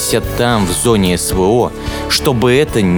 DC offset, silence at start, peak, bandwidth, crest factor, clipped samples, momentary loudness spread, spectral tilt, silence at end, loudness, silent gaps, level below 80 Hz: under 0.1%; 0 s; 0 dBFS; over 20 kHz; 12 dB; under 0.1%; 4 LU; -4.5 dB/octave; 0 s; -13 LUFS; none; -28 dBFS